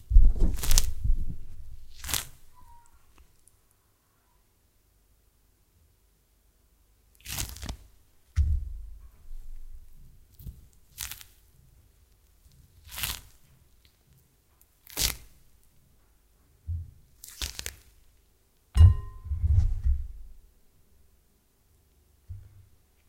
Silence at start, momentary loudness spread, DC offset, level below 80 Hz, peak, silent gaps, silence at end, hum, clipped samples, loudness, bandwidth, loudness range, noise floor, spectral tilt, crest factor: 0.1 s; 25 LU; under 0.1%; -32 dBFS; 0 dBFS; none; 0.7 s; none; under 0.1%; -29 LUFS; 17 kHz; 16 LU; -67 dBFS; -3.5 dB/octave; 30 dB